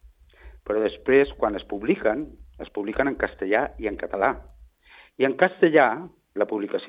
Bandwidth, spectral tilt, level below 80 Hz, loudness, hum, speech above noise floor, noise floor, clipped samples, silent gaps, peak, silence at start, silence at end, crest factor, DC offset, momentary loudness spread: 5 kHz; -8.5 dB/octave; -48 dBFS; -24 LUFS; none; 30 dB; -53 dBFS; under 0.1%; none; -2 dBFS; 0.05 s; 0 s; 22 dB; under 0.1%; 16 LU